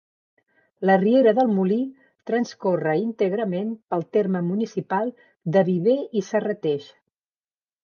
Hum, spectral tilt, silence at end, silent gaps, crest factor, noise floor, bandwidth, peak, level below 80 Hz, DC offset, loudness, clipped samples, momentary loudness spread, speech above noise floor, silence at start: none; -7.5 dB/octave; 1 s; none; 18 dB; under -90 dBFS; 7 kHz; -6 dBFS; -76 dBFS; under 0.1%; -23 LUFS; under 0.1%; 11 LU; over 68 dB; 0.8 s